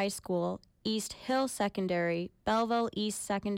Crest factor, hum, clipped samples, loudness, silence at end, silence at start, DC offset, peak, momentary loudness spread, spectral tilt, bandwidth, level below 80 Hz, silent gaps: 14 dB; none; under 0.1%; -33 LUFS; 0 s; 0 s; under 0.1%; -20 dBFS; 5 LU; -4.5 dB/octave; 17 kHz; -62 dBFS; none